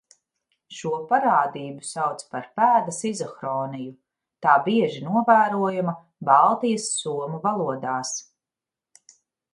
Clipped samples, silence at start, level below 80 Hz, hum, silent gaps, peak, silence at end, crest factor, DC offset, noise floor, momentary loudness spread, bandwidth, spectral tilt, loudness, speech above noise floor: under 0.1%; 0.7 s; -74 dBFS; none; none; -2 dBFS; 1.3 s; 22 dB; under 0.1%; -89 dBFS; 15 LU; 11.5 kHz; -4.5 dB/octave; -23 LUFS; 67 dB